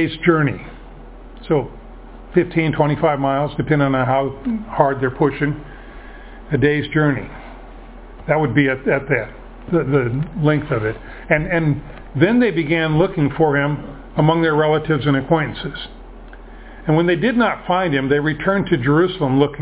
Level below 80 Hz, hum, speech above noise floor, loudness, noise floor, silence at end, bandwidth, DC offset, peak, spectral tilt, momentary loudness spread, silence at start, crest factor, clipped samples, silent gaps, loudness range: -40 dBFS; none; 20 dB; -18 LUFS; -37 dBFS; 0 s; 4 kHz; under 0.1%; 0 dBFS; -11 dB/octave; 15 LU; 0 s; 18 dB; under 0.1%; none; 3 LU